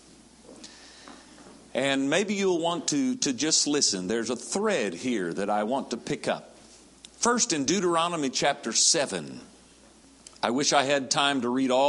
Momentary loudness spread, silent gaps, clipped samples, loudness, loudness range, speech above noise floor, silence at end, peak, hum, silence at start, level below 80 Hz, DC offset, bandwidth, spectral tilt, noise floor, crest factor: 12 LU; none; under 0.1%; -25 LUFS; 3 LU; 29 dB; 0 s; -6 dBFS; none; 0.5 s; -66 dBFS; under 0.1%; 11.5 kHz; -2.5 dB/octave; -54 dBFS; 22 dB